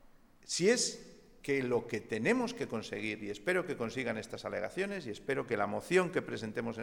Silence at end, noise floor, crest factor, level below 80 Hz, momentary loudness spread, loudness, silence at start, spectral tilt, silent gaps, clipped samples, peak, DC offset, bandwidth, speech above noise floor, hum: 0 s; -58 dBFS; 20 dB; -66 dBFS; 9 LU; -34 LUFS; 0.1 s; -4 dB/octave; none; under 0.1%; -16 dBFS; under 0.1%; 18 kHz; 23 dB; none